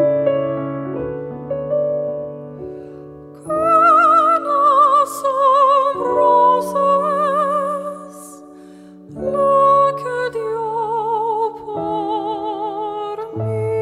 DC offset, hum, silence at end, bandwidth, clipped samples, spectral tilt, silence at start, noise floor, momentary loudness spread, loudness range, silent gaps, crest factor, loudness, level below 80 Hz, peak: under 0.1%; none; 0 s; 14.5 kHz; under 0.1%; -6 dB/octave; 0 s; -40 dBFS; 19 LU; 8 LU; none; 14 dB; -17 LUFS; -54 dBFS; -2 dBFS